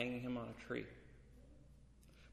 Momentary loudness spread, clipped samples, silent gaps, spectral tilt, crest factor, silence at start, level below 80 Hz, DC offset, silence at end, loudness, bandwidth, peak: 22 LU; under 0.1%; none; -6.5 dB/octave; 22 dB; 0 s; -66 dBFS; under 0.1%; 0 s; -46 LUFS; 13 kHz; -26 dBFS